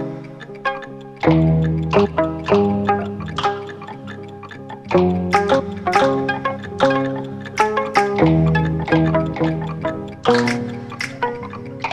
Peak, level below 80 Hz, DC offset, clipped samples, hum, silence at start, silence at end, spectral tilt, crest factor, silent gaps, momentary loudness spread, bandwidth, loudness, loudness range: -2 dBFS; -40 dBFS; under 0.1%; under 0.1%; none; 0 s; 0 s; -7 dB/octave; 18 dB; none; 16 LU; 10.5 kHz; -19 LUFS; 3 LU